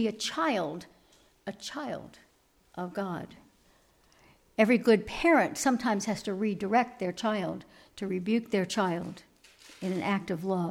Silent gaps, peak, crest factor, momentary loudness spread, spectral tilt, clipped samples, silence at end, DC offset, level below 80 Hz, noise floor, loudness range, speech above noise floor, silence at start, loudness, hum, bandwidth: none; -10 dBFS; 20 dB; 18 LU; -5 dB/octave; under 0.1%; 0 s; under 0.1%; -62 dBFS; -66 dBFS; 13 LU; 37 dB; 0 s; -30 LUFS; none; 16 kHz